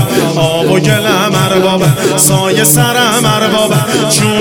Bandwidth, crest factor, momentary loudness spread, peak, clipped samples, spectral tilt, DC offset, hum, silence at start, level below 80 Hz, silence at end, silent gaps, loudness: over 20 kHz; 10 dB; 3 LU; 0 dBFS; 0.4%; -4 dB/octave; 0.3%; none; 0 s; -42 dBFS; 0 s; none; -9 LUFS